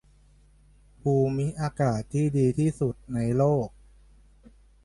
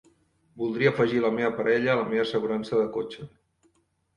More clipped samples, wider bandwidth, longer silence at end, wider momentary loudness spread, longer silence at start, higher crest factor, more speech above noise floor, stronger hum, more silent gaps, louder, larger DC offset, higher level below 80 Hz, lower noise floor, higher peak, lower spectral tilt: neither; about the same, 11.5 kHz vs 10.5 kHz; first, 1.15 s vs 0.9 s; second, 7 LU vs 11 LU; first, 1.05 s vs 0.55 s; about the same, 16 dB vs 20 dB; second, 33 dB vs 44 dB; neither; neither; about the same, -26 LUFS vs -25 LUFS; neither; first, -52 dBFS vs -64 dBFS; second, -57 dBFS vs -69 dBFS; second, -12 dBFS vs -8 dBFS; first, -8.5 dB/octave vs -7 dB/octave